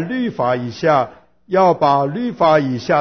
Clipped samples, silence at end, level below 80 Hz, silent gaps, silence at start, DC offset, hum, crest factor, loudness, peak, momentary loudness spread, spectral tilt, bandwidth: under 0.1%; 0 s; -54 dBFS; none; 0 s; 0.2%; none; 14 dB; -17 LUFS; -2 dBFS; 7 LU; -7 dB/octave; 6.4 kHz